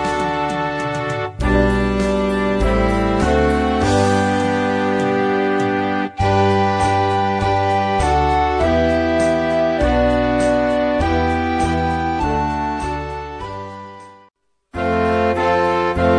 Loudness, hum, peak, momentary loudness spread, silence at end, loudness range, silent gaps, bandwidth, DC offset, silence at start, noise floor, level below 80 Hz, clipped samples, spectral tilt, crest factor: -17 LUFS; none; -4 dBFS; 6 LU; 0 s; 5 LU; none; 11 kHz; under 0.1%; 0 s; -57 dBFS; -28 dBFS; under 0.1%; -6.5 dB/octave; 14 dB